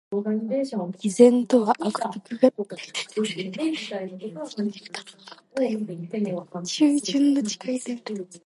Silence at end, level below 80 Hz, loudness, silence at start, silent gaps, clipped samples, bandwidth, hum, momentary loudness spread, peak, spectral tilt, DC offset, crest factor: 0.05 s; -76 dBFS; -24 LUFS; 0.1 s; none; under 0.1%; 11.5 kHz; none; 14 LU; -2 dBFS; -5 dB/octave; under 0.1%; 22 dB